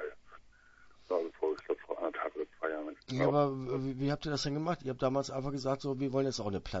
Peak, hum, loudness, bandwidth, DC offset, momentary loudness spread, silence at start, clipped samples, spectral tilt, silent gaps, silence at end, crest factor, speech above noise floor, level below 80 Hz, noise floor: -16 dBFS; none; -35 LUFS; 7.6 kHz; under 0.1%; 7 LU; 0 s; under 0.1%; -5.5 dB/octave; none; 0 s; 18 dB; 27 dB; -58 dBFS; -60 dBFS